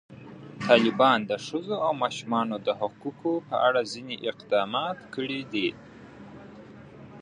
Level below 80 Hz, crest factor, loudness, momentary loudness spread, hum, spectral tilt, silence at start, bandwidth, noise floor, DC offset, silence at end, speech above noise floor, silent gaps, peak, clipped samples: -68 dBFS; 24 dB; -27 LUFS; 25 LU; none; -5 dB/octave; 0.1 s; 10.5 kHz; -47 dBFS; under 0.1%; 0 s; 20 dB; none; -4 dBFS; under 0.1%